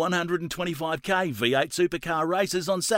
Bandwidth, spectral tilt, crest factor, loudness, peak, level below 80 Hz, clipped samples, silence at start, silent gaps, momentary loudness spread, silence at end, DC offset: 16 kHz; -4 dB/octave; 16 dB; -26 LUFS; -10 dBFS; -58 dBFS; under 0.1%; 0 s; none; 5 LU; 0 s; under 0.1%